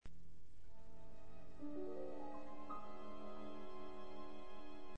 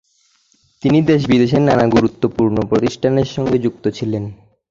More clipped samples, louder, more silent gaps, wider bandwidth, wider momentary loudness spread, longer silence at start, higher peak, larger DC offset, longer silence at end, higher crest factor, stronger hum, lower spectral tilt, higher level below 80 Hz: neither; second, -54 LUFS vs -16 LUFS; neither; first, 9 kHz vs 7.6 kHz; first, 16 LU vs 9 LU; second, 0 s vs 0.85 s; second, -34 dBFS vs -2 dBFS; first, 0.8% vs under 0.1%; second, 0 s vs 0.35 s; about the same, 14 dB vs 14 dB; neither; about the same, -7 dB/octave vs -7.5 dB/octave; second, -66 dBFS vs -44 dBFS